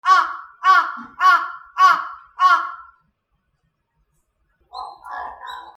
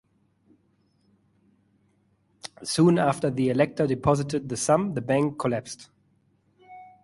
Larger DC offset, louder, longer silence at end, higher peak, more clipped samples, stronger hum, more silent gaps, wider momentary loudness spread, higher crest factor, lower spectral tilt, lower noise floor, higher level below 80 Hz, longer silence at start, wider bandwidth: neither; first, -17 LUFS vs -24 LUFS; about the same, 0.05 s vs 0.15 s; first, -2 dBFS vs -8 dBFS; neither; neither; neither; about the same, 20 LU vs 18 LU; about the same, 18 dB vs 20 dB; second, 0 dB/octave vs -6 dB/octave; about the same, -70 dBFS vs -67 dBFS; second, -66 dBFS vs -56 dBFS; second, 0.05 s vs 2.45 s; about the same, 12.5 kHz vs 11.5 kHz